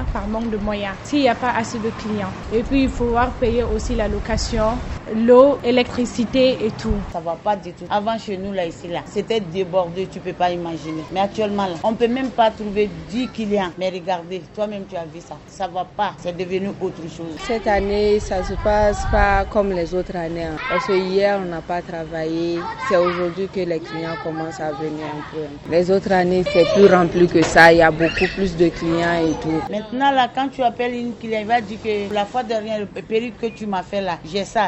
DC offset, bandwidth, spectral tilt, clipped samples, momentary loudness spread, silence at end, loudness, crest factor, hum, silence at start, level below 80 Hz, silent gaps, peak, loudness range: under 0.1%; 9.8 kHz; -5.5 dB/octave; under 0.1%; 11 LU; 0 s; -20 LUFS; 20 dB; none; 0 s; -34 dBFS; none; 0 dBFS; 9 LU